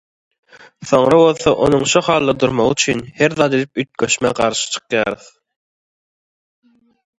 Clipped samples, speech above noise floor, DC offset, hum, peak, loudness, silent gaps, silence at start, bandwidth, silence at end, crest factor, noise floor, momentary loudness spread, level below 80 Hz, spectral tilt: under 0.1%; over 75 dB; under 0.1%; none; 0 dBFS; -15 LUFS; none; 0.8 s; 11 kHz; 2.05 s; 16 dB; under -90 dBFS; 9 LU; -48 dBFS; -4 dB/octave